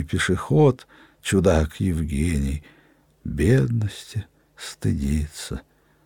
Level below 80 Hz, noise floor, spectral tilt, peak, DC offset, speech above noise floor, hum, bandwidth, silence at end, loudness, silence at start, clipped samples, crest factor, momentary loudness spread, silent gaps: -34 dBFS; -45 dBFS; -6.5 dB/octave; -6 dBFS; under 0.1%; 23 dB; none; 17.5 kHz; 0.45 s; -23 LUFS; 0 s; under 0.1%; 18 dB; 15 LU; none